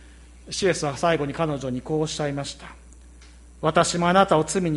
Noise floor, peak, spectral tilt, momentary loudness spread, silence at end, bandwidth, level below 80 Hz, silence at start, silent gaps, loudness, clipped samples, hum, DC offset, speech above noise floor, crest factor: -47 dBFS; -4 dBFS; -4.5 dB/octave; 13 LU; 0 s; 11.5 kHz; -48 dBFS; 0 s; none; -23 LUFS; under 0.1%; none; under 0.1%; 24 dB; 20 dB